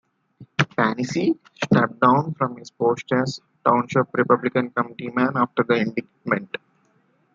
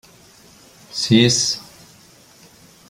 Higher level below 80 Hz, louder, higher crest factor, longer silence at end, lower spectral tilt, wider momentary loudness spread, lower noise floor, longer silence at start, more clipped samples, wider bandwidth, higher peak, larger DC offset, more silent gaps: second, -62 dBFS vs -56 dBFS; second, -22 LUFS vs -17 LUFS; about the same, 20 dB vs 20 dB; second, 0.9 s vs 1.25 s; first, -6.5 dB/octave vs -3.5 dB/octave; second, 9 LU vs 15 LU; first, -63 dBFS vs -49 dBFS; second, 0.4 s vs 0.95 s; neither; second, 7.6 kHz vs 16 kHz; about the same, -2 dBFS vs -2 dBFS; neither; neither